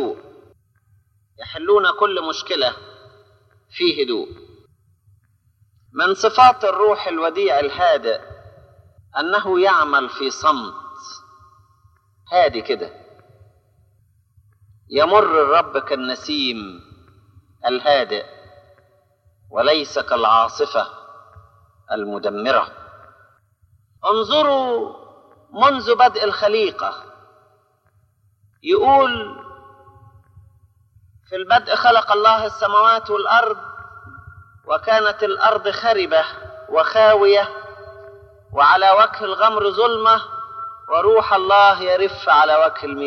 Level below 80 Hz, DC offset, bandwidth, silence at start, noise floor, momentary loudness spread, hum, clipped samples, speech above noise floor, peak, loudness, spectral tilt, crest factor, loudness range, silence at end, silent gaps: -58 dBFS; under 0.1%; 6.8 kHz; 0 s; -60 dBFS; 18 LU; none; under 0.1%; 44 dB; 0 dBFS; -17 LUFS; -3.5 dB/octave; 18 dB; 8 LU; 0 s; none